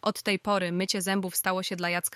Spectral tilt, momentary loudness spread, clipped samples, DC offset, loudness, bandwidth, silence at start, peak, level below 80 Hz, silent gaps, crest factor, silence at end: -3.5 dB/octave; 2 LU; under 0.1%; under 0.1%; -28 LUFS; 16 kHz; 0.05 s; -12 dBFS; -70 dBFS; none; 16 dB; 0 s